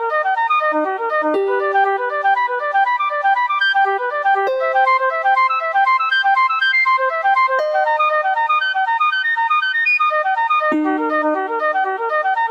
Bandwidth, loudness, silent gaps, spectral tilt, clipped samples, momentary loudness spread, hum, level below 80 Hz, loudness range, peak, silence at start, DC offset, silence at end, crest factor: 7.8 kHz; -16 LUFS; none; -2.5 dB/octave; under 0.1%; 4 LU; none; -78 dBFS; 2 LU; -6 dBFS; 0 s; under 0.1%; 0 s; 10 dB